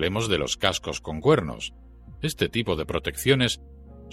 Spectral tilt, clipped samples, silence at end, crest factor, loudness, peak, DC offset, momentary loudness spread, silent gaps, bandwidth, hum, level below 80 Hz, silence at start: -4.5 dB/octave; under 0.1%; 0 s; 22 dB; -25 LUFS; -4 dBFS; under 0.1%; 11 LU; none; 16.5 kHz; none; -44 dBFS; 0 s